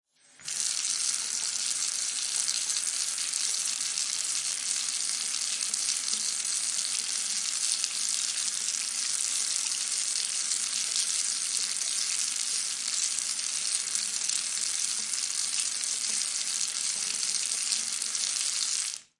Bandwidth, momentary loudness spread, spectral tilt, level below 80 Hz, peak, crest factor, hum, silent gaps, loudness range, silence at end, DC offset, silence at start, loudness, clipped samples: 11.5 kHz; 2 LU; 3.5 dB/octave; -82 dBFS; -8 dBFS; 22 dB; none; none; 1 LU; 0.15 s; under 0.1%; 0.4 s; -27 LUFS; under 0.1%